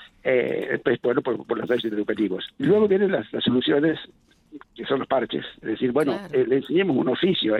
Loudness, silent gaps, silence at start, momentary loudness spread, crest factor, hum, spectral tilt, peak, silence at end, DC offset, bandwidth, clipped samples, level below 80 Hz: -23 LUFS; none; 0 s; 7 LU; 16 dB; none; -7.5 dB/octave; -8 dBFS; 0 s; under 0.1%; 11.5 kHz; under 0.1%; -62 dBFS